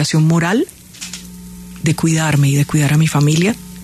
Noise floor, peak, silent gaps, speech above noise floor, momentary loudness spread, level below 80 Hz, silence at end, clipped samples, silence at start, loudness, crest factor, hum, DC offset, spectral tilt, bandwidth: -33 dBFS; -2 dBFS; none; 20 dB; 17 LU; -44 dBFS; 0 s; under 0.1%; 0 s; -15 LUFS; 14 dB; none; under 0.1%; -5.5 dB/octave; 13.5 kHz